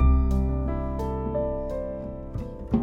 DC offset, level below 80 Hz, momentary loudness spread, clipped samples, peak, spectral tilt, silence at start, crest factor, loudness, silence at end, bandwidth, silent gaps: under 0.1%; -28 dBFS; 11 LU; under 0.1%; -10 dBFS; -10 dB/octave; 0 s; 16 dB; -29 LUFS; 0 s; 3.8 kHz; none